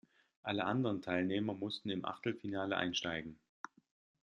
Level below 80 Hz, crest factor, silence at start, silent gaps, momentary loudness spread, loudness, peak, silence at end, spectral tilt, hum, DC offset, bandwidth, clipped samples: -76 dBFS; 22 dB; 0.45 s; none; 17 LU; -38 LUFS; -18 dBFS; 0.9 s; -5 dB/octave; none; under 0.1%; 9.8 kHz; under 0.1%